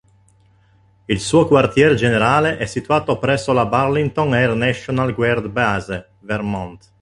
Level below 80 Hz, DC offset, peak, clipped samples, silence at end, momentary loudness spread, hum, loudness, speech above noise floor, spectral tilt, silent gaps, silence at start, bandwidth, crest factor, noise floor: -44 dBFS; under 0.1%; -2 dBFS; under 0.1%; 0.25 s; 11 LU; none; -17 LUFS; 37 dB; -6 dB/octave; none; 1.1 s; 11.5 kHz; 16 dB; -54 dBFS